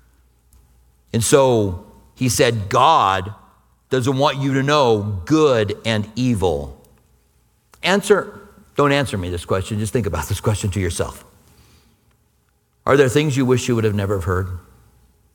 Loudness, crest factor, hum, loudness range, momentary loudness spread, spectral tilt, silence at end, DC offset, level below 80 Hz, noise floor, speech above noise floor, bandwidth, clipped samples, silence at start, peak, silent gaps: -18 LUFS; 20 dB; none; 5 LU; 11 LU; -5 dB/octave; 0.75 s; under 0.1%; -42 dBFS; -62 dBFS; 45 dB; 19 kHz; under 0.1%; 1.15 s; 0 dBFS; none